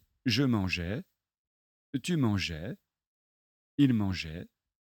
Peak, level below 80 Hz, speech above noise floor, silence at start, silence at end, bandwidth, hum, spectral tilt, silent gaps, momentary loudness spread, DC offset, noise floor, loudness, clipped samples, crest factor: -12 dBFS; -56 dBFS; over 61 dB; 0.25 s; 0.4 s; 17 kHz; none; -6 dB/octave; 1.38-1.93 s, 3.07-3.78 s; 14 LU; under 0.1%; under -90 dBFS; -31 LUFS; under 0.1%; 20 dB